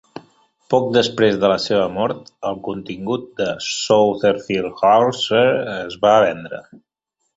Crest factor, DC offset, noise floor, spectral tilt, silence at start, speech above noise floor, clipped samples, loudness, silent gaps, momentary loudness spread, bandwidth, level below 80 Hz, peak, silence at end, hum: 16 dB; under 0.1%; -74 dBFS; -4.5 dB/octave; 0.15 s; 56 dB; under 0.1%; -18 LUFS; none; 13 LU; 8 kHz; -56 dBFS; -2 dBFS; 0.6 s; none